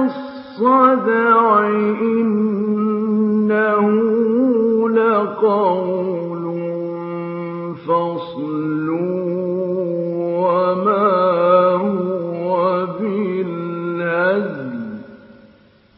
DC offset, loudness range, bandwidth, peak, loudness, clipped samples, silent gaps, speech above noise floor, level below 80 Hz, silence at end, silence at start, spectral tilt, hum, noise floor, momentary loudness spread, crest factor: under 0.1%; 6 LU; 5.6 kHz; -2 dBFS; -18 LUFS; under 0.1%; none; 35 dB; -66 dBFS; 0.65 s; 0 s; -12.5 dB/octave; none; -50 dBFS; 12 LU; 16 dB